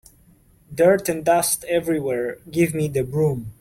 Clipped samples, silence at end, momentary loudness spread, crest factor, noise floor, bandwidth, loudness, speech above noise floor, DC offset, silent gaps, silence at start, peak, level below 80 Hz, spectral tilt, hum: under 0.1%; 0.1 s; 8 LU; 16 dB; -54 dBFS; 16.5 kHz; -21 LUFS; 34 dB; under 0.1%; none; 0.7 s; -4 dBFS; -52 dBFS; -5 dB/octave; none